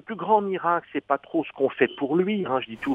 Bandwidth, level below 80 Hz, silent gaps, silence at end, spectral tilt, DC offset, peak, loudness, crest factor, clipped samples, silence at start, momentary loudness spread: 4.9 kHz; -68 dBFS; none; 0 s; -8 dB/octave; under 0.1%; -4 dBFS; -25 LUFS; 20 dB; under 0.1%; 0.1 s; 5 LU